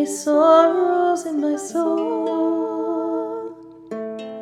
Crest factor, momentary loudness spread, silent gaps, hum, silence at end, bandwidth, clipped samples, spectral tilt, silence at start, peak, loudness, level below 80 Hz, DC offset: 16 dB; 17 LU; none; none; 0 s; 13.5 kHz; under 0.1%; -4 dB/octave; 0 s; -4 dBFS; -19 LUFS; -72 dBFS; under 0.1%